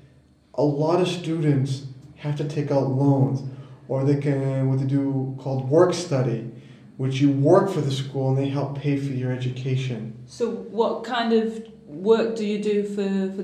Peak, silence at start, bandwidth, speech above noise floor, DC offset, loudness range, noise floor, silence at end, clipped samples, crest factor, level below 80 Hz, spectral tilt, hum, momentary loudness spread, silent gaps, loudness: -4 dBFS; 0.55 s; 9.6 kHz; 32 dB; under 0.1%; 4 LU; -54 dBFS; 0 s; under 0.1%; 18 dB; -64 dBFS; -7.5 dB/octave; none; 11 LU; none; -23 LUFS